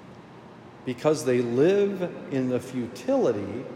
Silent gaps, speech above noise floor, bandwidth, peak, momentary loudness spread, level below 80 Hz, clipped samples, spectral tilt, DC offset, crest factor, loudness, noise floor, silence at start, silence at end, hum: none; 21 dB; 14.5 kHz; -8 dBFS; 12 LU; -70 dBFS; under 0.1%; -6.5 dB/octave; under 0.1%; 18 dB; -26 LUFS; -46 dBFS; 0 s; 0 s; none